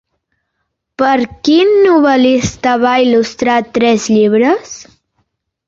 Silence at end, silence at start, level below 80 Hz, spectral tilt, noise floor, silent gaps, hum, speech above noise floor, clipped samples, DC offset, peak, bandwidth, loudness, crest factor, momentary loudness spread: 0.85 s; 1 s; -46 dBFS; -4.5 dB/octave; -71 dBFS; none; none; 60 dB; under 0.1%; under 0.1%; 0 dBFS; 7.8 kHz; -11 LUFS; 12 dB; 6 LU